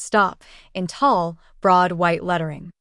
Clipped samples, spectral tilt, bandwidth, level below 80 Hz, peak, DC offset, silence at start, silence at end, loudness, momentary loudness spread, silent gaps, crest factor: under 0.1%; -5.5 dB/octave; 11.5 kHz; -52 dBFS; -4 dBFS; under 0.1%; 0 s; 0.1 s; -20 LUFS; 13 LU; none; 16 dB